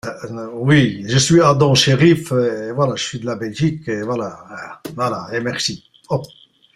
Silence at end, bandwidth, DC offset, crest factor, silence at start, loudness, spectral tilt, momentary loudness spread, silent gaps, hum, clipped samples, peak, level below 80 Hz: 0.5 s; 13.5 kHz; under 0.1%; 16 dB; 0.05 s; -17 LUFS; -5 dB/octave; 17 LU; none; none; under 0.1%; -2 dBFS; -50 dBFS